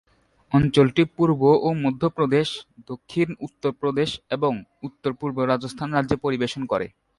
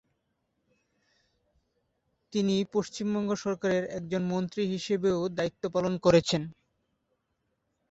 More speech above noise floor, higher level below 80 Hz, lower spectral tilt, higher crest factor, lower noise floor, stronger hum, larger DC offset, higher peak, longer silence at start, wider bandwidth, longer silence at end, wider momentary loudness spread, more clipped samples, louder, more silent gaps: second, 22 dB vs 50 dB; first, -52 dBFS vs -62 dBFS; about the same, -7 dB/octave vs -6 dB/octave; about the same, 18 dB vs 22 dB; second, -44 dBFS vs -79 dBFS; neither; neither; first, -4 dBFS vs -10 dBFS; second, 0.5 s vs 2.3 s; first, 11.5 kHz vs 8 kHz; second, 0.3 s vs 1.4 s; first, 11 LU vs 8 LU; neither; first, -23 LUFS vs -29 LUFS; neither